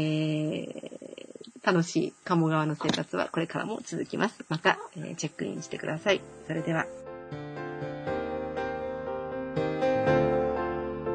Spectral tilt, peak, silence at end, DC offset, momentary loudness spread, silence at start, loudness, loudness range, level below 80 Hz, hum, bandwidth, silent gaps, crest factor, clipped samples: -5.5 dB/octave; -8 dBFS; 0 s; under 0.1%; 13 LU; 0 s; -30 LUFS; 4 LU; -56 dBFS; none; 9.8 kHz; none; 22 dB; under 0.1%